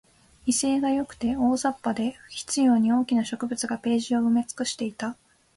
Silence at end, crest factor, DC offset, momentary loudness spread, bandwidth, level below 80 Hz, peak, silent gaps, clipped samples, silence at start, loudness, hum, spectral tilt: 0.45 s; 14 dB; under 0.1%; 9 LU; 11.5 kHz; -58 dBFS; -12 dBFS; none; under 0.1%; 0.45 s; -25 LUFS; none; -3.5 dB/octave